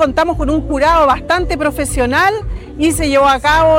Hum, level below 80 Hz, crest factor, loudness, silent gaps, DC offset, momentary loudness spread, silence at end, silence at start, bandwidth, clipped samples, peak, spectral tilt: none; -26 dBFS; 10 dB; -13 LUFS; none; under 0.1%; 6 LU; 0 s; 0 s; 16.5 kHz; under 0.1%; -4 dBFS; -4.5 dB/octave